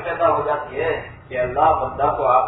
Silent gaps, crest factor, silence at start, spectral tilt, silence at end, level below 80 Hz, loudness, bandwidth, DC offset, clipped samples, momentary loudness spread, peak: none; 16 dB; 0 s; -9.5 dB/octave; 0 s; -44 dBFS; -20 LUFS; 4.1 kHz; under 0.1%; under 0.1%; 8 LU; -4 dBFS